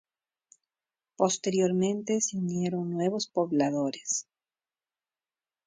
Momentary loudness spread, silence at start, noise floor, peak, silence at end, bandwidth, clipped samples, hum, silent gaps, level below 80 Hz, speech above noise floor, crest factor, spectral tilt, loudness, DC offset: 5 LU; 1.2 s; under -90 dBFS; -10 dBFS; 1.45 s; 9.6 kHz; under 0.1%; none; none; -74 dBFS; over 62 dB; 20 dB; -5 dB/octave; -29 LUFS; under 0.1%